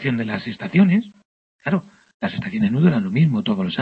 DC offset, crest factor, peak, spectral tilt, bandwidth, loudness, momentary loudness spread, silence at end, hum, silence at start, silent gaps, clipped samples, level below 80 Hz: under 0.1%; 16 dB; -4 dBFS; -9 dB/octave; 5.2 kHz; -20 LUFS; 11 LU; 0 s; none; 0 s; 1.25-1.59 s, 2.14-2.20 s; under 0.1%; -56 dBFS